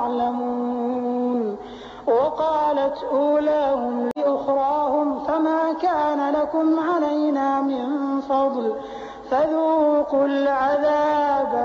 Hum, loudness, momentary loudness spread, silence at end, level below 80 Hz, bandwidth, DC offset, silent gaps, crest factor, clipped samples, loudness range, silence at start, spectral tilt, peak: none; -21 LUFS; 6 LU; 0 s; -58 dBFS; 7.2 kHz; under 0.1%; none; 10 dB; under 0.1%; 1 LU; 0 s; -3.5 dB/octave; -10 dBFS